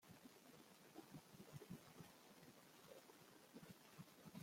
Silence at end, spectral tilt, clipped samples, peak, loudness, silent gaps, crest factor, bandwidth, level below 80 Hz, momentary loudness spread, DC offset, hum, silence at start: 0 s; -4.5 dB/octave; under 0.1%; -44 dBFS; -63 LUFS; none; 18 dB; 16.5 kHz; -88 dBFS; 6 LU; under 0.1%; none; 0 s